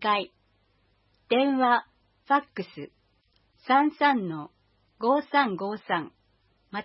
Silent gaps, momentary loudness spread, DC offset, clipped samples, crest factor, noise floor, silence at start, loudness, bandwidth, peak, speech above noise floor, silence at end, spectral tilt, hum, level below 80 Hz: none; 19 LU; under 0.1%; under 0.1%; 20 dB; -68 dBFS; 0 s; -26 LUFS; 5.8 kHz; -8 dBFS; 43 dB; 0 s; -9 dB/octave; none; -74 dBFS